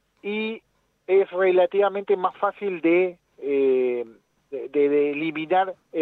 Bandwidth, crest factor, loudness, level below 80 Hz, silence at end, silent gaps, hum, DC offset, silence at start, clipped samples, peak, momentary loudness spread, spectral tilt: 4.2 kHz; 14 dB; -23 LUFS; -76 dBFS; 0 s; none; none; under 0.1%; 0.25 s; under 0.1%; -10 dBFS; 14 LU; -8 dB/octave